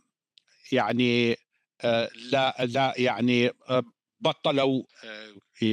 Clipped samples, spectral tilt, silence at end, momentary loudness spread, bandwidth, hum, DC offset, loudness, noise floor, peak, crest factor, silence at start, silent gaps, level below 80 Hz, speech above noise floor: under 0.1%; -6 dB/octave; 0 s; 13 LU; 9.8 kHz; none; under 0.1%; -26 LUFS; -65 dBFS; -10 dBFS; 18 dB; 0.7 s; none; -74 dBFS; 40 dB